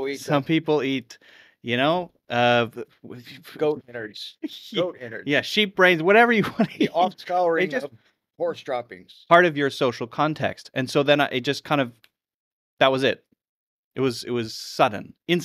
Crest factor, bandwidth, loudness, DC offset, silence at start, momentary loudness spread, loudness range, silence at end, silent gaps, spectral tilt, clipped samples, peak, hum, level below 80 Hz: 24 dB; 15 kHz; -22 LUFS; under 0.1%; 0 s; 17 LU; 5 LU; 0 s; 12.34-12.77 s, 13.49-13.91 s; -5 dB/octave; under 0.1%; 0 dBFS; none; -68 dBFS